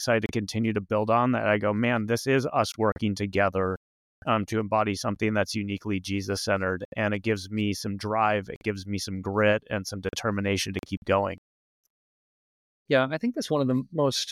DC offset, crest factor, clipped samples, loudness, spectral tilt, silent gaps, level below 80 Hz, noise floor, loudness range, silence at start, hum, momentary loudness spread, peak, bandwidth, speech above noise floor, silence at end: under 0.1%; 16 dB; under 0.1%; -27 LUFS; -5.5 dB/octave; 2.92-2.96 s, 3.77-4.22 s, 6.85-6.92 s, 8.56-8.61 s, 10.97-11.02 s, 11.38-11.84 s, 11.90-12.86 s; -58 dBFS; under -90 dBFS; 4 LU; 0 s; none; 7 LU; -10 dBFS; 15 kHz; over 64 dB; 0 s